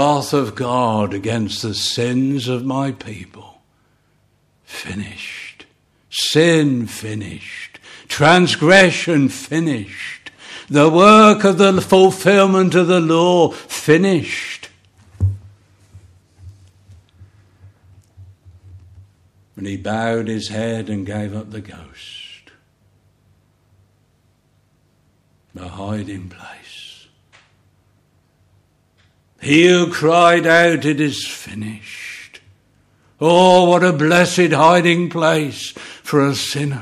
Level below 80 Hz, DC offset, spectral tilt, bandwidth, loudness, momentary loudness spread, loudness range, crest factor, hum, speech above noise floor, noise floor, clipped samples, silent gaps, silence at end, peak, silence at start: -52 dBFS; under 0.1%; -5 dB/octave; 14 kHz; -15 LUFS; 23 LU; 21 LU; 18 dB; none; 44 dB; -59 dBFS; under 0.1%; none; 0 s; 0 dBFS; 0 s